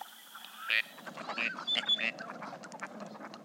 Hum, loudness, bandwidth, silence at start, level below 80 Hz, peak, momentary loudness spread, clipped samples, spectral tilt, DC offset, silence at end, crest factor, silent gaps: none; -33 LUFS; 16 kHz; 0 s; under -90 dBFS; -12 dBFS; 17 LU; under 0.1%; -1.5 dB/octave; under 0.1%; 0 s; 24 dB; none